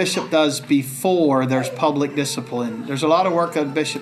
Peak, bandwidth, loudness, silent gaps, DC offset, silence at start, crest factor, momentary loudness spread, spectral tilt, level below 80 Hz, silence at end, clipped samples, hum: -4 dBFS; 15 kHz; -20 LUFS; none; under 0.1%; 0 s; 14 dB; 7 LU; -5 dB/octave; -74 dBFS; 0 s; under 0.1%; none